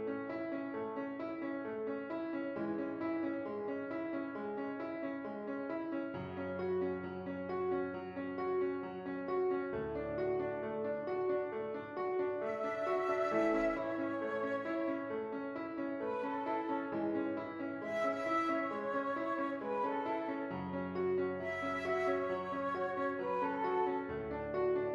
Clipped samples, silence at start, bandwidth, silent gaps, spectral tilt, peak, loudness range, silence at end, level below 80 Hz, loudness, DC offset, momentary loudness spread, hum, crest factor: under 0.1%; 0 s; 7.6 kHz; none; -7.5 dB/octave; -22 dBFS; 4 LU; 0 s; -70 dBFS; -38 LUFS; under 0.1%; 7 LU; none; 16 dB